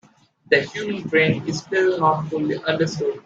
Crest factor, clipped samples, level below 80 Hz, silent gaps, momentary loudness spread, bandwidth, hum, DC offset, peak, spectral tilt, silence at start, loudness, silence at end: 20 dB; under 0.1%; -60 dBFS; none; 6 LU; 7.8 kHz; none; under 0.1%; -2 dBFS; -5.5 dB/octave; 0.5 s; -21 LUFS; 0.05 s